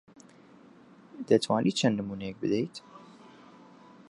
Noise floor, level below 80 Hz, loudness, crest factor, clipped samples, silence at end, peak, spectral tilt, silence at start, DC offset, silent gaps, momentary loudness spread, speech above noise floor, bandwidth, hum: -55 dBFS; -68 dBFS; -28 LUFS; 24 dB; under 0.1%; 1.05 s; -8 dBFS; -5.5 dB/octave; 1.15 s; under 0.1%; none; 20 LU; 27 dB; 11 kHz; none